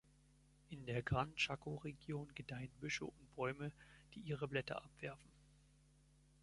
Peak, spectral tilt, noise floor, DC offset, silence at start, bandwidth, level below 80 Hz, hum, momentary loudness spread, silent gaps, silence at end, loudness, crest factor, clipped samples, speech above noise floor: -24 dBFS; -5 dB/octave; -71 dBFS; under 0.1%; 0.7 s; 11.5 kHz; -66 dBFS; none; 13 LU; none; 0.85 s; -45 LUFS; 22 dB; under 0.1%; 25 dB